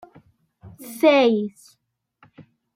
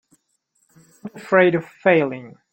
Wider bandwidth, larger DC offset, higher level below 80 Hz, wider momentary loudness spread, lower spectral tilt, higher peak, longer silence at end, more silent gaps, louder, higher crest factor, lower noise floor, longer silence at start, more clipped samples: first, 16 kHz vs 8.8 kHz; neither; about the same, -68 dBFS vs -66 dBFS; about the same, 23 LU vs 22 LU; second, -5 dB/octave vs -7.5 dB/octave; about the same, -4 dBFS vs -2 dBFS; first, 1.25 s vs 0.25 s; neither; about the same, -19 LUFS vs -18 LUFS; about the same, 18 dB vs 20 dB; second, -59 dBFS vs -68 dBFS; second, 0.65 s vs 1.05 s; neither